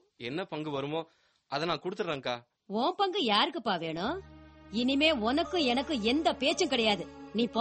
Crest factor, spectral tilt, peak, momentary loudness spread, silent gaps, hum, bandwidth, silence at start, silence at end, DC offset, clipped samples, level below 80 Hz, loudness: 20 dB; -4 dB/octave; -12 dBFS; 12 LU; none; none; 8.4 kHz; 0.2 s; 0 s; under 0.1%; under 0.1%; -60 dBFS; -30 LUFS